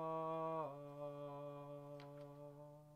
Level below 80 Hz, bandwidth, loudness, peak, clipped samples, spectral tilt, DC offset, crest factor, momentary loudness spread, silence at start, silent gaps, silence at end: -84 dBFS; 15.5 kHz; -49 LUFS; -32 dBFS; under 0.1%; -8 dB/octave; under 0.1%; 16 dB; 13 LU; 0 s; none; 0 s